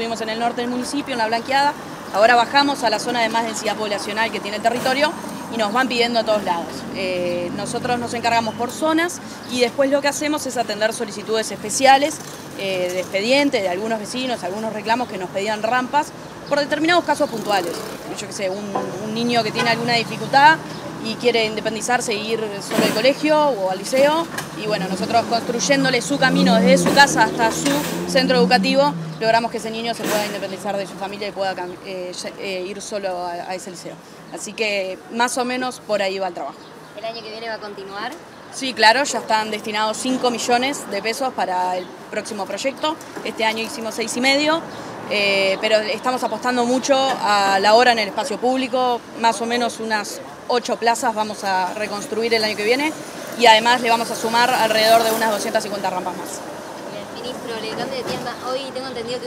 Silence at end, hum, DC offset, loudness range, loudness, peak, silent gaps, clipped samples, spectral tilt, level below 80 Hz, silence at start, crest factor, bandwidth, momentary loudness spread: 0 s; none; under 0.1%; 8 LU; -19 LUFS; 0 dBFS; none; under 0.1%; -3.5 dB/octave; -60 dBFS; 0 s; 20 dB; 16 kHz; 15 LU